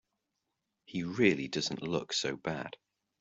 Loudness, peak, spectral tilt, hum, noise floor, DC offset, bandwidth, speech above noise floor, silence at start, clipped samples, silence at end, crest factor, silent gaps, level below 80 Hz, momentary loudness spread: -33 LUFS; -12 dBFS; -4 dB/octave; none; -85 dBFS; under 0.1%; 8.2 kHz; 52 dB; 0.9 s; under 0.1%; 0.45 s; 22 dB; none; -70 dBFS; 12 LU